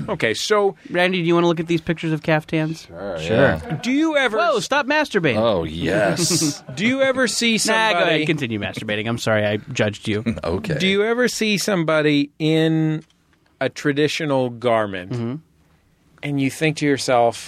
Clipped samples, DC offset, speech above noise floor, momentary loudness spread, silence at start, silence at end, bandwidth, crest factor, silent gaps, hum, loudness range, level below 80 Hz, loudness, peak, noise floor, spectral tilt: under 0.1%; under 0.1%; 39 dB; 7 LU; 0 s; 0 s; 15.5 kHz; 16 dB; none; none; 4 LU; -50 dBFS; -20 LUFS; -4 dBFS; -59 dBFS; -4.5 dB/octave